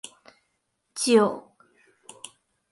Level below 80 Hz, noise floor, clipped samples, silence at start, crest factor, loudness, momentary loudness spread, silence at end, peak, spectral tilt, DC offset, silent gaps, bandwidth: -76 dBFS; -76 dBFS; under 0.1%; 0.95 s; 22 dB; -22 LUFS; 24 LU; 1.3 s; -6 dBFS; -3.5 dB/octave; under 0.1%; none; 11.5 kHz